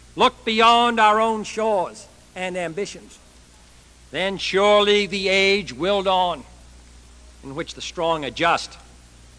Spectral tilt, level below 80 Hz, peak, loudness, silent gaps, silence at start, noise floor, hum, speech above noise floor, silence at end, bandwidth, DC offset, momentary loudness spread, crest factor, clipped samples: -3.5 dB/octave; -50 dBFS; 0 dBFS; -20 LUFS; none; 0.15 s; -49 dBFS; none; 29 dB; 0.6 s; 11 kHz; under 0.1%; 16 LU; 20 dB; under 0.1%